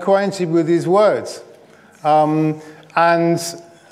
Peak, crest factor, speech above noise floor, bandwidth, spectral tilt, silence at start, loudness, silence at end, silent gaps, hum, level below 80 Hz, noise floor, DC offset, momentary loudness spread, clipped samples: -2 dBFS; 14 dB; 30 dB; 16 kHz; -6 dB/octave; 0 s; -17 LUFS; 0.3 s; none; none; -74 dBFS; -46 dBFS; under 0.1%; 16 LU; under 0.1%